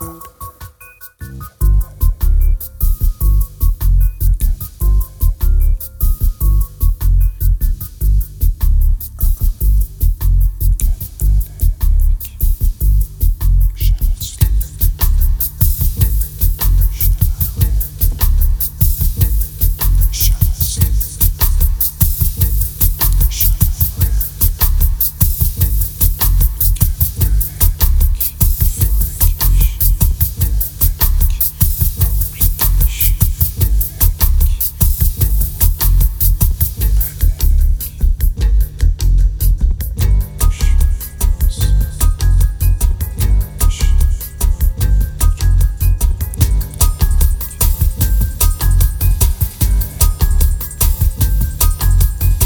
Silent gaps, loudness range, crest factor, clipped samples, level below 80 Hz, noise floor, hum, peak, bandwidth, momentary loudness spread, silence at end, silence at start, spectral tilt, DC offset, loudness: none; 3 LU; 12 dB; under 0.1%; -14 dBFS; -38 dBFS; none; 0 dBFS; over 20 kHz; 5 LU; 0 s; 0 s; -4.5 dB/octave; under 0.1%; -15 LUFS